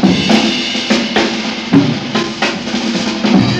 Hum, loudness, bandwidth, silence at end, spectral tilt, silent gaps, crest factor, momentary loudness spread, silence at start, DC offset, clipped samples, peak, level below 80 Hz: none; -13 LUFS; 10.5 kHz; 0 s; -4.5 dB/octave; none; 14 dB; 6 LU; 0 s; under 0.1%; 0.3%; 0 dBFS; -44 dBFS